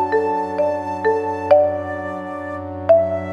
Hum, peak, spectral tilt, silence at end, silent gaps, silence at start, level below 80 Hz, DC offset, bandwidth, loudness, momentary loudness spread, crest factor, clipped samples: none; 0 dBFS; -7.5 dB/octave; 0 s; none; 0 s; -58 dBFS; under 0.1%; 7.4 kHz; -19 LUFS; 13 LU; 18 dB; under 0.1%